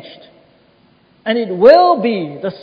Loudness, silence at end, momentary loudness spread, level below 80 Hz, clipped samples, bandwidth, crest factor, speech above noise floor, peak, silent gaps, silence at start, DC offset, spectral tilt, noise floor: -12 LUFS; 0.05 s; 15 LU; -58 dBFS; 0.3%; 5.4 kHz; 14 dB; 40 dB; 0 dBFS; none; 0.05 s; under 0.1%; -7.5 dB/octave; -52 dBFS